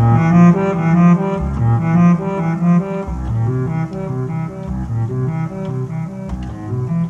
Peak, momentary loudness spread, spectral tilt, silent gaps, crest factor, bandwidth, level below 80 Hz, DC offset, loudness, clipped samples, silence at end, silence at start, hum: 0 dBFS; 12 LU; -9.5 dB/octave; none; 16 dB; 7 kHz; -32 dBFS; under 0.1%; -17 LUFS; under 0.1%; 0 s; 0 s; none